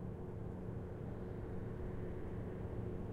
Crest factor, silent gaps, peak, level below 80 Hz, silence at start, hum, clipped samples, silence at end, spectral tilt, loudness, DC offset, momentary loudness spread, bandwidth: 12 dB; none; -32 dBFS; -52 dBFS; 0 s; none; under 0.1%; 0 s; -10 dB/octave; -46 LUFS; under 0.1%; 2 LU; 7.6 kHz